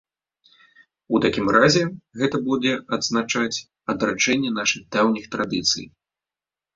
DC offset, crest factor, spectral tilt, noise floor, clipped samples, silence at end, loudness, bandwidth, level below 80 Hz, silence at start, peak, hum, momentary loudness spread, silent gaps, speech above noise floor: under 0.1%; 22 dB; -3.5 dB/octave; under -90 dBFS; under 0.1%; 0.85 s; -21 LUFS; 7.8 kHz; -56 dBFS; 1.1 s; -2 dBFS; none; 9 LU; none; over 68 dB